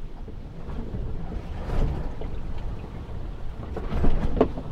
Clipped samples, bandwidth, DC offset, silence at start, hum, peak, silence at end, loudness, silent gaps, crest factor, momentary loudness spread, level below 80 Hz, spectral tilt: under 0.1%; 5.2 kHz; under 0.1%; 0 s; none; -6 dBFS; 0 s; -32 LUFS; none; 20 dB; 12 LU; -28 dBFS; -8.5 dB/octave